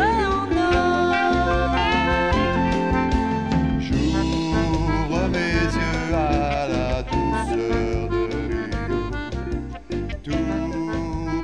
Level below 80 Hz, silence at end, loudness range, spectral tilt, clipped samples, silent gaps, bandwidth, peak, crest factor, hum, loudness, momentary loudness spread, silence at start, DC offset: -30 dBFS; 0 s; 6 LU; -6.5 dB/octave; under 0.1%; none; 10.5 kHz; -8 dBFS; 14 dB; none; -22 LUFS; 7 LU; 0 s; 0.5%